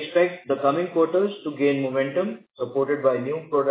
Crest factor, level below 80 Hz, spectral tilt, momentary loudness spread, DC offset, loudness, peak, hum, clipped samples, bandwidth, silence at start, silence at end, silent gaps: 16 dB; -80 dBFS; -10 dB/octave; 5 LU; under 0.1%; -24 LUFS; -6 dBFS; none; under 0.1%; 4 kHz; 0 s; 0 s; none